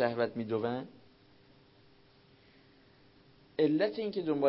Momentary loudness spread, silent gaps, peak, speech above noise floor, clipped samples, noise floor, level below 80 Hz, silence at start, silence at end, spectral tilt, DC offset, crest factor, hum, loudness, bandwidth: 12 LU; none; -16 dBFS; 31 dB; under 0.1%; -63 dBFS; -74 dBFS; 0 s; 0 s; -5 dB/octave; under 0.1%; 20 dB; none; -33 LUFS; 5.6 kHz